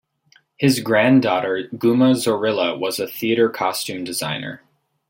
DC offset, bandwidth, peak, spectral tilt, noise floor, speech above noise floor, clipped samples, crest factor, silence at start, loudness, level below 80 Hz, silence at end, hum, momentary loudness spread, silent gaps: under 0.1%; 17 kHz; -4 dBFS; -5 dB/octave; -58 dBFS; 39 dB; under 0.1%; 16 dB; 0.6 s; -19 LUFS; -64 dBFS; 0.55 s; none; 10 LU; none